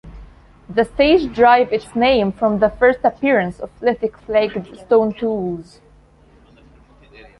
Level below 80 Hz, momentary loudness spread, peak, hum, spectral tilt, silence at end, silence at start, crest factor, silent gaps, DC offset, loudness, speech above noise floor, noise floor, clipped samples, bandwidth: -44 dBFS; 11 LU; 0 dBFS; none; -6.5 dB/octave; 1.75 s; 0.05 s; 18 dB; none; under 0.1%; -17 LUFS; 33 dB; -49 dBFS; under 0.1%; 11 kHz